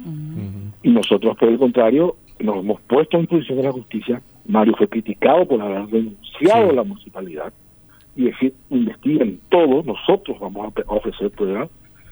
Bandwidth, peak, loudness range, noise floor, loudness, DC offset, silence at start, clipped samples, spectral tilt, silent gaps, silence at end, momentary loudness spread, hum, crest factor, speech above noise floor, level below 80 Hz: over 20 kHz; 0 dBFS; 3 LU; -49 dBFS; -18 LUFS; under 0.1%; 0 s; under 0.1%; -7.5 dB/octave; none; 0.45 s; 14 LU; none; 18 dB; 31 dB; -50 dBFS